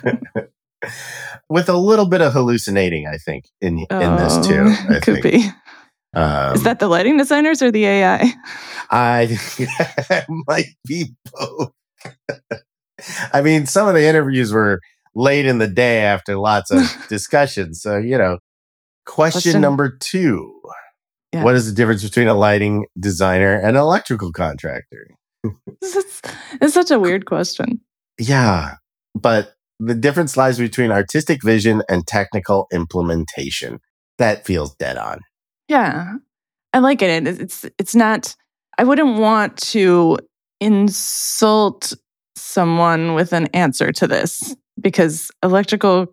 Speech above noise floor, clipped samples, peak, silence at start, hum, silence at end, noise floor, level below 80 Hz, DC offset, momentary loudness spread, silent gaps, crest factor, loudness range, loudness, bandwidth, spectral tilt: 38 dB; under 0.1%; -2 dBFS; 0.05 s; none; 0.05 s; -54 dBFS; -48 dBFS; under 0.1%; 15 LU; 18.39-19.02 s, 33.90-34.18 s; 16 dB; 5 LU; -16 LUFS; 19.5 kHz; -5.5 dB/octave